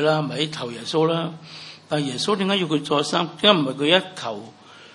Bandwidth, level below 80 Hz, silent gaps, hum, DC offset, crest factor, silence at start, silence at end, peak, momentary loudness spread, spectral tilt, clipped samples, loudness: 11.5 kHz; -70 dBFS; none; none; under 0.1%; 22 dB; 0 s; 0.05 s; 0 dBFS; 14 LU; -4.5 dB/octave; under 0.1%; -22 LUFS